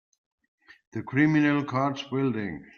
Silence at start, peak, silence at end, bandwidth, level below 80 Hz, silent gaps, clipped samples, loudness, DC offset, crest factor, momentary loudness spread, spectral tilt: 0.95 s; -10 dBFS; 0.15 s; 6.8 kHz; -66 dBFS; none; under 0.1%; -26 LUFS; under 0.1%; 18 dB; 13 LU; -7.5 dB/octave